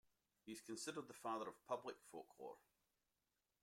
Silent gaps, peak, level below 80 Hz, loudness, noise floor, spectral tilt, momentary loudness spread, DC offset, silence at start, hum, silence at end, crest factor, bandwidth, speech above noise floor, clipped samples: none; -32 dBFS; under -90 dBFS; -52 LUFS; under -90 dBFS; -3.5 dB/octave; 11 LU; under 0.1%; 0.45 s; none; 1.05 s; 22 dB; 16.5 kHz; over 38 dB; under 0.1%